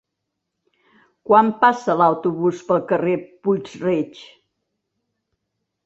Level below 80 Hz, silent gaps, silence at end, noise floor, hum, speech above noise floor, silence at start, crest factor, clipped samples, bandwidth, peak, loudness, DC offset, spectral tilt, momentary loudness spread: -68 dBFS; none; 1.6 s; -79 dBFS; none; 61 dB; 1.3 s; 20 dB; under 0.1%; 8 kHz; -2 dBFS; -19 LUFS; under 0.1%; -7 dB/octave; 8 LU